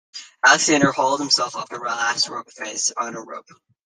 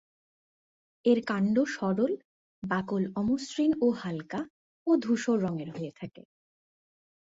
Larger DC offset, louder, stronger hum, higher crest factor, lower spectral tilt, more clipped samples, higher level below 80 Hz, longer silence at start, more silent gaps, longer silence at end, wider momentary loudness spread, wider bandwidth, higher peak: neither; first, -19 LUFS vs -29 LUFS; neither; about the same, 20 dB vs 18 dB; second, -1.5 dB/octave vs -6.5 dB/octave; neither; about the same, -64 dBFS vs -68 dBFS; second, 0.15 s vs 1.05 s; second, none vs 2.25-2.62 s, 4.50-4.86 s; second, 0.45 s vs 1.2 s; first, 18 LU vs 12 LU; first, 11 kHz vs 8 kHz; first, -2 dBFS vs -12 dBFS